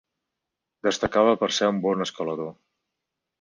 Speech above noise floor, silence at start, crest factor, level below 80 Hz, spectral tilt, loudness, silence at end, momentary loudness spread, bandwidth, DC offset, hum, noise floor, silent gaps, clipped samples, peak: 61 dB; 0.85 s; 20 dB; -58 dBFS; -4 dB/octave; -24 LUFS; 0.9 s; 10 LU; 10 kHz; under 0.1%; none; -85 dBFS; none; under 0.1%; -6 dBFS